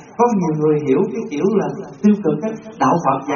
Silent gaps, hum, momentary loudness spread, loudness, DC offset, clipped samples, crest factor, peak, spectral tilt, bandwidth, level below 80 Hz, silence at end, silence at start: none; none; 6 LU; -18 LUFS; under 0.1%; under 0.1%; 16 dB; -2 dBFS; -7.5 dB/octave; 7 kHz; -58 dBFS; 0 s; 0 s